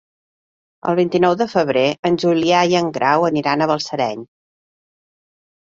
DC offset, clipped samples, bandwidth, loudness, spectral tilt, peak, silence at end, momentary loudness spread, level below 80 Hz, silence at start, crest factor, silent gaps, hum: under 0.1%; under 0.1%; 7.6 kHz; -17 LUFS; -5.5 dB/octave; -2 dBFS; 1.35 s; 7 LU; -58 dBFS; 0.85 s; 16 dB; 1.99-2.03 s; none